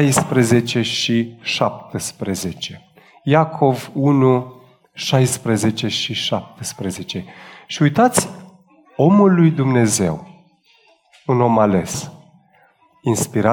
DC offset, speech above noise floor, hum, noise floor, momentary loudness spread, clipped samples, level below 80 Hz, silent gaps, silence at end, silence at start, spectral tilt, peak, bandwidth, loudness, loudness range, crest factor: under 0.1%; 38 dB; none; -55 dBFS; 14 LU; under 0.1%; -54 dBFS; none; 0 s; 0 s; -5 dB/octave; -2 dBFS; 19.5 kHz; -18 LUFS; 4 LU; 16 dB